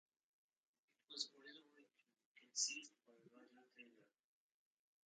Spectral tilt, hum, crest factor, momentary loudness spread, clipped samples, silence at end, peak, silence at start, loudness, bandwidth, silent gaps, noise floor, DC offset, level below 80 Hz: 2 dB/octave; none; 28 dB; 26 LU; under 0.1%; 1.05 s; -28 dBFS; 1.1 s; -46 LUFS; 9 kHz; 2.26-2.35 s; -76 dBFS; under 0.1%; under -90 dBFS